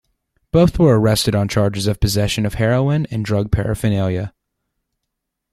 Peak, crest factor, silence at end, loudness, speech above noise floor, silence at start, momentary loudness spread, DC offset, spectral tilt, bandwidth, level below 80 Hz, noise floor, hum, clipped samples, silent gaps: -2 dBFS; 16 dB; 1.25 s; -17 LUFS; 62 dB; 0.55 s; 7 LU; under 0.1%; -6 dB/octave; 14.5 kHz; -34 dBFS; -78 dBFS; none; under 0.1%; none